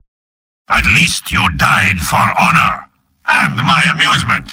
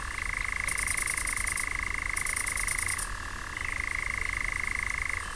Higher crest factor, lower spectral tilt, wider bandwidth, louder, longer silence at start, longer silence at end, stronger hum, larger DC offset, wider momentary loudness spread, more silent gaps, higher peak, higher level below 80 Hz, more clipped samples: about the same, 14 dB vs 18 dB; first, -3.5 dB/octave vs -1 dB/octave; first, 16.5 kHz vs 11 kHz; first, -11 LUFS vs -30 LUFS; first, 0.7 s vs 0 s; about the same, 0 s vs 0 s; neither; second, under 0.1% vs 0.3%; about the same, 5 LU vs 5 LU; neither; first, 0 dBFS vs -14 dBFS; first, -32 dBFS vs -40 dBFS; neither